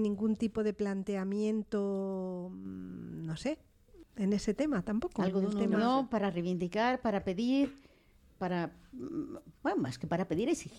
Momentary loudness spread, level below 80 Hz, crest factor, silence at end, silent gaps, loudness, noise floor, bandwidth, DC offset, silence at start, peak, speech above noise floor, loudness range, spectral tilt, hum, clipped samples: 11 LU; -60 dBFS; 16 dB; 0 s; none; -34 LUFS; -63 dBFS; 11.5 kHz; under 0.1%; 0 s; -18 dBFS; 30 dB; 5 LU; -6.5 dB/octave; none; under 0.1%